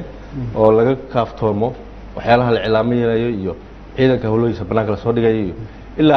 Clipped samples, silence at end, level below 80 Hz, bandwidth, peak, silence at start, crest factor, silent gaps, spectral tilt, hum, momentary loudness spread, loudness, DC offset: under 0.1%; 0 s; -38 dBFS; 6.2 kHz; 0 dBFS; 0 s; 16 dB; none; -9 dB/octave; none; 16 LU; -17 LUFS; under 0.1%